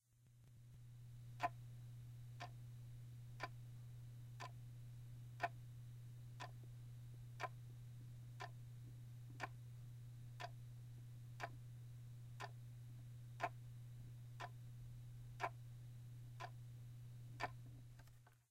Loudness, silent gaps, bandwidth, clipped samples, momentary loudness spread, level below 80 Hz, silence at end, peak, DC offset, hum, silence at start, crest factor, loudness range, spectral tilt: -55 LUFS; none; 16 kHz; under 0.1%; 8 LU; -70 dBFS; 0.05 s; -28 dBFS; under 0.1%; none; 0.05 s; 26 dB; 2 LU; -5.5 dB/octave